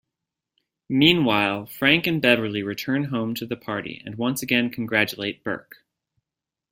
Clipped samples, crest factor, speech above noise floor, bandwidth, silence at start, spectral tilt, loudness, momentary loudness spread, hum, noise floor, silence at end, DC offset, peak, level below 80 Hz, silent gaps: under 0.1%; 22 dB; 65 dB; 16 kHz; 0.9 s; -5 dB/octave; -22 LUFS; 12 LU; none; -88 dBFS; 1.1 s; under 0.1%; -2 dBFS; -60 dBFS; none